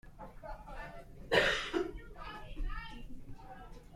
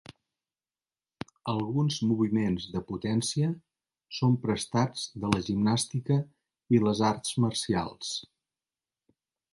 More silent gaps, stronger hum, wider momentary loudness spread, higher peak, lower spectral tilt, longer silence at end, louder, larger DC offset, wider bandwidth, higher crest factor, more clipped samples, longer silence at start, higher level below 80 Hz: neither; neither; first, 23 LU vs 9 LU; second, -12 dBFS vs -8 dBFS; second, -4 dB/octave vs -5.5 dB/octave; second, 0 s vs 1.3 s; second, -35 LUFS vs -29 LUFS; neither; first, 15.5 kHz vs 11.5 kHz; about the same, 26 dB vs 22 dB; neither; second, 0.05 s vs 1.45 s; first, -46 dBFS vs -58 dBFS